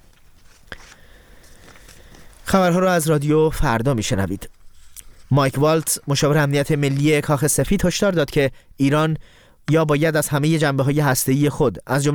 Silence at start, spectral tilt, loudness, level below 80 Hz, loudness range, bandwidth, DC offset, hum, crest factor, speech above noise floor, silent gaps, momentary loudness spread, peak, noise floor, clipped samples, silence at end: 0.7 s; -5.5 dB/octave; -19 LUFS; -38 dBFS; 2 LU; 19.5 kHz; under 0.1%; none; 16 dB; 30 dB; none; 6 LU; -2 dBFS; -48 dBFS; under 0.1%; 0 s